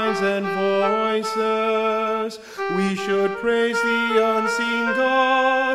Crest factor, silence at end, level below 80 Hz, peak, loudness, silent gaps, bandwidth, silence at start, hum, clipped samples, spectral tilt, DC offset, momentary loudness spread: 16 dB; 0 s; -62 dBFS; -6 dBFS; -20 LUFS; none; 14.5 kHz; 0 s; none; under 0.1%; -4.5 dB/octave; 0.2%; 5 LU